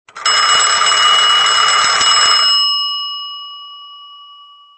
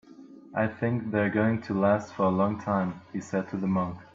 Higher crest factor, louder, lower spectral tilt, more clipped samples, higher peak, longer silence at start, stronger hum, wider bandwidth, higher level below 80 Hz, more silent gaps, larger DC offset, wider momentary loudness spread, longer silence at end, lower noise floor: about the same, 14 dB vs 16 dB; first, -10 LUFS vs -28 LUFS; second, 3 dB/octave vs -8 dB/octave; neither; first, 0 dBFS vs -12 dBFS; about the same, 0.15 s vs 0.2 s; neither; first, 8.8 kHz vs 7.6 kHz; first, -56 dBFS vs -64 dBFS; neither; neither; first, 16 LU vs 7 LU; first, 0.55 s vs 0.1 s; second, -41 dBFS vs -49 dBFS